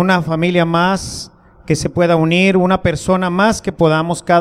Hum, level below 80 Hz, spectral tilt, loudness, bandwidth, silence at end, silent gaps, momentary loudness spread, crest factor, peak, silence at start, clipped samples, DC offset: none; -40 dBFS; -5.5 dB/octave; -14 LUFS; 14 kHz; 0 s; none; 8 LU; 14 dB; 0 dBFS; 0 s; under 0.1%; under 0.1%